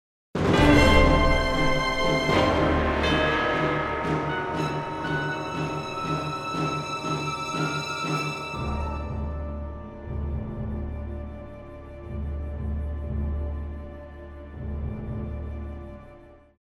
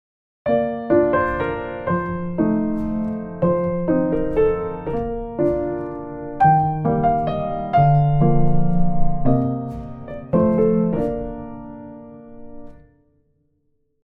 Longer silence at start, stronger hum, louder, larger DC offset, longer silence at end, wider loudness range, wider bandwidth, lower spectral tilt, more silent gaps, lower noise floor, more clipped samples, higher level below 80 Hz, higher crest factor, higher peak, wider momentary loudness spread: about the same, 0.35 s vs 0.45 s; neither; second, -26 LUFS vs -20 LUFS; neither; second, 0.25 s vs 1.35 s; first, 13 LU vs 5 LU; first, 13.5 kHz vs 4 kHz; second, -5.5 dB/octave vs -11 dB/octave; neither; second, -49 dBFS vs -66 dBFS; neither; about the same, -32 dBFS vs -34 dBFS; first, 22 dB vs 16 dB; about the same, -4 dBFS vs -4 dBFS; about the same, 17 LU vs 15 LU